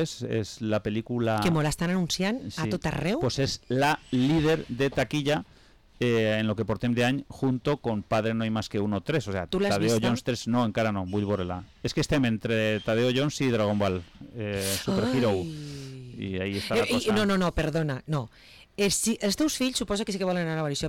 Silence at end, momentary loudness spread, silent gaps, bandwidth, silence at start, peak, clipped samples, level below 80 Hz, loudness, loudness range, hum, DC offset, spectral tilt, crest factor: 0 s; 7 LU; none; 18.5 kHz; 0 s; -18 dBFS; under 0.1%; -50 dBFS; -27 LUFS; 1 LU; none; under 0.1%; -5 dB/octave; 10 dB